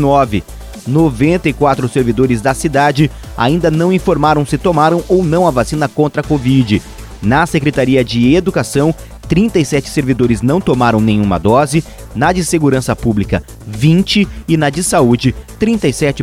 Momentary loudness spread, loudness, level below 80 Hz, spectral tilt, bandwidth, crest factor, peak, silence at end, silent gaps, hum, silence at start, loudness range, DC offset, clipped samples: 6 LU; -13 LUFS; -30 dBFS; -6 dB/octave; 16 kHz; 12 dB; 0 dBFS; 0 s; none; none; 0 s; 1 LU; under 0.1%; under 0.1%